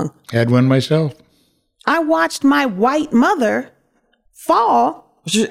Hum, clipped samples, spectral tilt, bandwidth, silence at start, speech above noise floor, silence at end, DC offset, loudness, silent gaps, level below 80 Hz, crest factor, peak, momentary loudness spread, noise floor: none; under 0.1%; -5.5 dB/octave; 15.5 kHz; 0 s; 46 dB; 0 s; under 0.1%; -16 LUFS; none; -60 dBFS; 14 dB; -2 dBFS; 9 LU; -61 dBFS